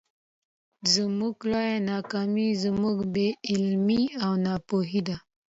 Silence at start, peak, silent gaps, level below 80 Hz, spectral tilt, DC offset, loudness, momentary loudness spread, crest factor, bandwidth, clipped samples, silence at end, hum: 0.85 s; -8 dBFS; none; -60 dBFS; -5 dB/octave; under 0.1%; -26 LUFS; 5 LU; 18 dB; 8 kHz; under 0.1%; 0.3 s; none